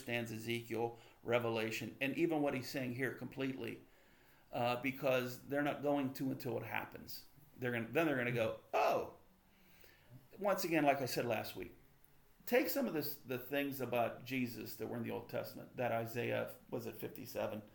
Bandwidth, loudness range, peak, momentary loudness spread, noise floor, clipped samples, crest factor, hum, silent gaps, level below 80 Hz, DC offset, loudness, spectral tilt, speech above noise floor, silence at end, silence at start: 19 kHz; 3 LU; -18 dBFS; 11 LU; -67 dBFS; under 0.1%; 22 dB; none; none; -72 dBFS; under 0.1%; -39 LUFS; -5.5 dB/octave; 28 dB; 0.05 s; 0 s